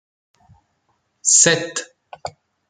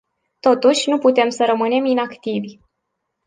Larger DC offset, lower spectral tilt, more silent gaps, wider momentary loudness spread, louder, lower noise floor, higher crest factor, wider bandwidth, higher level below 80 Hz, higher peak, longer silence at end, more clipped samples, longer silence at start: neither; second, -1 dB/octave vs -4 dB/octave; neither; first, 23 LU vs 10 LU; first, -14 LUFS vs -17 LUFS; second, -68 dBFS vs -76 dBFS; first, 22 dB vs 16 dB; about the same, 10 kHz vs 9.8 kHz; about the same, -66 dBFS vs -68 dBFS; about the same, 0 dBFS vs -2 dBFS; second, 0.4 s vs 0.75 s; neither; first, 1.25 s vs 0.45 s